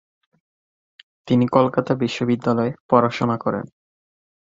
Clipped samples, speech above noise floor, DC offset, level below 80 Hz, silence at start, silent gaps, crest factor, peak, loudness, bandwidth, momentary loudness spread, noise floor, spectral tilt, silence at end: under 0.1%; over 71 dB; under 0.1%; -58 dBFS; 1.25 s; 2.80-2.89 s; 20 dB; -2 dBFS; -20 LUFS; 7.6 kHz; 7 LU; under -90 dBFS; -7.5 dB/octave; 0.85 s